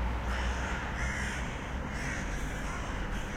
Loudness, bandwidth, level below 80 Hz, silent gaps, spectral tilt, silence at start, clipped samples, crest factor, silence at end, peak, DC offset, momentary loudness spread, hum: -35 LUFS; 15 kHz; -36 dBFS; none; -4.5 dB/octave; 0 s; under 0.1%; 14 dB; 0 s; -20 dBFS; under 0.1%; 4 LU; none